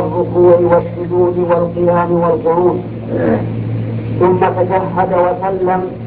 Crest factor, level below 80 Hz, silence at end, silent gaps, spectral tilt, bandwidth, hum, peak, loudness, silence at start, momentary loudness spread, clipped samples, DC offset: 12 dB; -40 dBFS; 0 s; none; -13 dB/octave; 4.3 kHz; none; 0 dBFS; -14 LUFS; 0 s; 9 LU; under 0.1%; under 0.1%